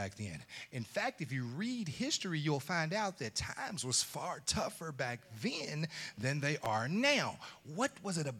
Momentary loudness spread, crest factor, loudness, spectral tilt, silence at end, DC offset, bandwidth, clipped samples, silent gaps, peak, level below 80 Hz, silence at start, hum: 8 LU; 20 dB; -37 LUFS; -3.5 dB/octave; 0 s; under 0.1%; 17 kHz; under 0.1%; none; -18 dBFS; -66 dBFS; 0 s; none